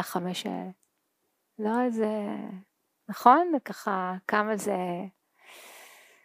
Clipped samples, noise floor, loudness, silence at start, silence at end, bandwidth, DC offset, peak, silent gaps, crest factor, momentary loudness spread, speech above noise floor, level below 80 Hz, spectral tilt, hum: under 0.1%; -77 dBFS; -27 LUFS; 0 s; 0.35 s; 15.5 kHz; under 0.1%; -4 dBFS; none; 26 dB; 24 LU; 49 dB; -86 dBFS; -5 dB/octave; none